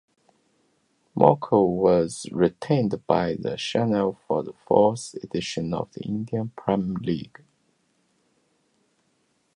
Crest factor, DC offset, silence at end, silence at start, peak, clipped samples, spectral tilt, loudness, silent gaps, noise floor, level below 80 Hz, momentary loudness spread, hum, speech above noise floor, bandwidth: 24 dB; under 0.1%; 2.3 s; 1.15 s; 0 dBFS; under 0.1%; -6.5 dB/octave; -24 LUFS; none; -69 dBFS; -56 dBFS; 11 LU; none; 46 dB; 11 kHz